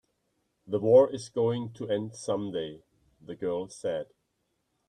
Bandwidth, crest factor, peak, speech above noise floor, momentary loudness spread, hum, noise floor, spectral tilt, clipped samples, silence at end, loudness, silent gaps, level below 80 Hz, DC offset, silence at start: 9.6 kHz; 20 dB; -8 dBFS; 50 dB; 15 LU; none; -78 dBFS; -6.5 dB/octave; under 0.1%; 0.85 s; -29 LUFS; none; -70 dBFS; under 0.1%; 0.7 s